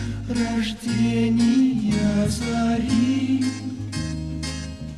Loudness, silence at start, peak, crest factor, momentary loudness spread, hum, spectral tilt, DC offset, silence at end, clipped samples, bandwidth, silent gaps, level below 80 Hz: -23 LUFS; 0 s; -10 dBFS; 12 dB; 10 LU; none; -6 dB/octave; 0.2%; 0 s; under 0.1%; 12.5 kHz; none; -38 dBFS